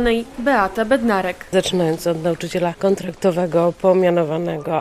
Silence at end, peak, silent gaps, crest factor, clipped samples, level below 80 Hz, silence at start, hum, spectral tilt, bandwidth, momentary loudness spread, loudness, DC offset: 0 s; -2 dBFS; none; 16 dB; under 0.1%; -44 dBFS; 0 s; none; -6 dB/octave; 15 kHz; 6 LU; -19 LUFS; under 0.1%